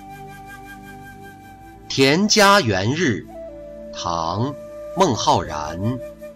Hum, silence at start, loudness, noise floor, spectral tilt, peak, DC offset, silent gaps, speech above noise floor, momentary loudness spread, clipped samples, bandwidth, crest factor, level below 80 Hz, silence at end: none; 0 s; -19 LUFS; -41 dBFS; -4 dB/octave; -4 dBFS; under 0.1%; none; 23 dB; 24 LU; under 0.1%; 16 kHz; 16 dB; -46 dBFS; 0 s